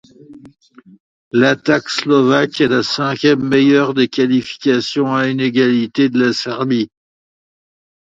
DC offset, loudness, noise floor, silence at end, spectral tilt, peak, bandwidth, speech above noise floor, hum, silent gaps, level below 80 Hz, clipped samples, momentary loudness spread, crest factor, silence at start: under 0.1%; -15 LUFS; -40 dBFS; 1.35 s; -5.5 dB/octave; 0 dBFS; 7.8 kHz; 26 dB; none; 1.00-1.31 s; -58 dBFS; under 0.1%; 5 LU; 16 dB; 0.3 s